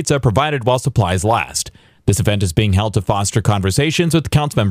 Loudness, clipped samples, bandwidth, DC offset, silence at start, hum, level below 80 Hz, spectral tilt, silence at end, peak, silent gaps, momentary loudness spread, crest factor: -16 LUFS; under 0.1%; 16 kHz; under 0.1%; 0 s; none; -36 dBFS; -5 dB/octave; 0 s; -2 dBFS; none; 4 LU; 14 dB